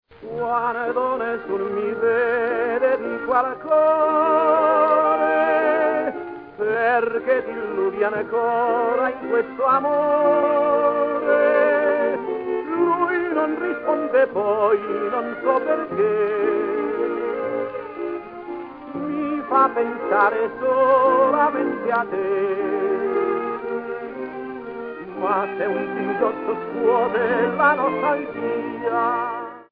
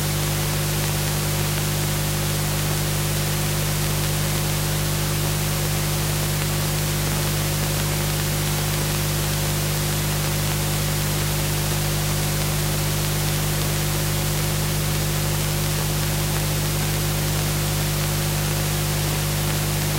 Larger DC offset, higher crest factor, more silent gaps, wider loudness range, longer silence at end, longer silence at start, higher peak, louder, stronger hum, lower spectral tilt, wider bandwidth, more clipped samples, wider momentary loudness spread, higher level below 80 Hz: neither; about the same, 16 dB vs 18 dB; neither; first, 6 LU vs 0 LU; about the same, 0.1 s vs 0 s; first, 0.2 s vs 0 s; about the same, -4 dBFS vs -4 dBFS; about the same, -21 LUFS vs -22 LUFS; second, none vs 50 Hz at -25 dBFS; first, -9 dB/octave vs -4 dB/octave; second, 5 kHz vs 16 kHz; neither; first, 11 LU vs 0 LU; second, -62 dBFS vs -32 dBFS